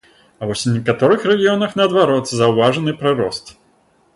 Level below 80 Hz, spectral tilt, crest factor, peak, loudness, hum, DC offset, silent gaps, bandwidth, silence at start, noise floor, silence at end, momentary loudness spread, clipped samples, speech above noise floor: -54 dBFS; -5.5 dB/octave; 16 dB; -2 dBFS; -16 LUFS; none; under 0.1%; none; 11.5 kHz; 0.4 s; -56 dBFS; 0.65 s; 9 LU; under 0.1%; 41 dB